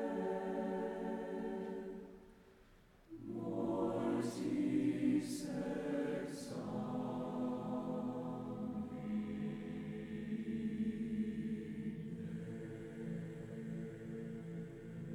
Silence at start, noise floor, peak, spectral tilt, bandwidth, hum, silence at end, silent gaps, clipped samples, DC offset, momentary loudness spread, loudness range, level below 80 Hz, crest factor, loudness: 0 s; -65 dBFS; -24 dBFS; -7 dB/octave; 14.5 kHz; none; 0 s; none; under 0.1%; under 0.1%; 10 LU; 6 LU; -68 dBFS; 16 dB; -42 LUFS